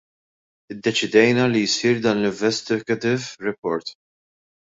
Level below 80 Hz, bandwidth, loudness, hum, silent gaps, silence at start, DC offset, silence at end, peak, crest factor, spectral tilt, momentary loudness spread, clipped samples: -62 dBFS; 7.8 kHz; -21 LUFS; none; 3.58-3.63 s; 0.7 s; under 0.1%; 0.75 s; -2 dBFS; 20 dB; -4.5 dB/octave; 11 LU; under 0.1%